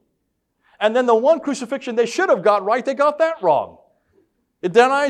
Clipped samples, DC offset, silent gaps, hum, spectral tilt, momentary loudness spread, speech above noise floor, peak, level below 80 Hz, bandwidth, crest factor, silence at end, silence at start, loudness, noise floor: under 0.1%; under 0.1%; none; none; -4.5 dB/octave; 9 LU; 55 dB; -2 dBFS; -70 dBFS; 11 kHz; 16 dB; 0 s; 0.8 s; -18 LUFS; -72 dBFS